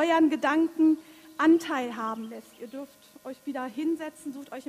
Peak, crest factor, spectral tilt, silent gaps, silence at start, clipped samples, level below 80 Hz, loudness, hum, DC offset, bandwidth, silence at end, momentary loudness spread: -12 dBFS; 16 dB; -4.5 dB/octave; none; 0 s; under 0.1%; -74 dBFS; -27 LUFS; none; under 0.1%; 14 kHz; 0.1 s; 20 LU